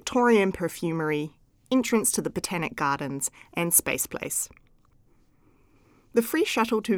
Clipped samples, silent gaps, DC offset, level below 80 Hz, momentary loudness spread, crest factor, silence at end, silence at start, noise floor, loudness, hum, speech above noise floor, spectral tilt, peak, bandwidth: under 0.1%; none; under 0.1%; -58 dBFS; 9 LU; 22 dB; 0 s; 0.05 s; -61 dBFS; -25 LUFS; none; 36 dB; -3.5 dB/octave; -6 dBFS; over 20 kHz